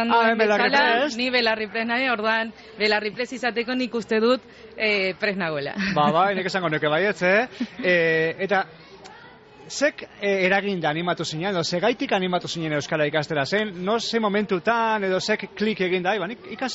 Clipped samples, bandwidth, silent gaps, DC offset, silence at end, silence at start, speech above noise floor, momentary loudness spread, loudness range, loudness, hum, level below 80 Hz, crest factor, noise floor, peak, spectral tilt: under 0.1%; 8 kHz; none; under 0.1%; 0 s; 0 s; 24 dB; 7 LU; 3 LU; -22 LUFS; none; -62 dBFS; 16 dB; -46 dBFS; -6 dBFS; -2.5 dB/octave